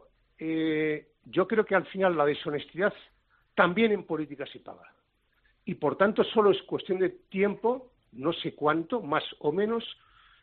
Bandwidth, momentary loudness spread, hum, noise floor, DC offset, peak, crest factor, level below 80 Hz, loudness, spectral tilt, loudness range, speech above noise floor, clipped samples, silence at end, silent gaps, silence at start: 4.5 kHz; 14 LU; none; -71 dBFS; under 0.1%; -8 dBFS; 20 dB; -68 dBFS; -28 LUFS; -4 dB/octave; 3 LU; 43 dB; under 0.1%; 0.5 s; none; 0.4 s